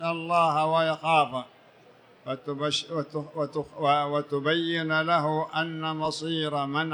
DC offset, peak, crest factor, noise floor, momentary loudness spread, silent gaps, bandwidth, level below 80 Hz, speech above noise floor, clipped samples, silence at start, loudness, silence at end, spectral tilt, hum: under 0.1%; -10 dBFS; 18 dB; -55 dBFS; 10 LU; none; 11 kHz; -72 dBFS; 29 dB; under 0.1%; 0 s; -27 LUFS; 0 s; -5 dB/octave; none